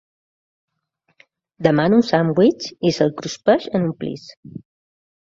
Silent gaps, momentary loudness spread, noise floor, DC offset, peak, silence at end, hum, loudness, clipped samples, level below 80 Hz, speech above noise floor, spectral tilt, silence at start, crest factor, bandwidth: 4.37-4.43 s; 19 LU; -69 dBFS; under 0.1%; 0 dBFS; 0.75 s; none; -18 LUFS; under 0.1%; -58 dBFS; 51 dB; -6.5 dB/octave; 1.6 s; 20 dB; 7.8 kHz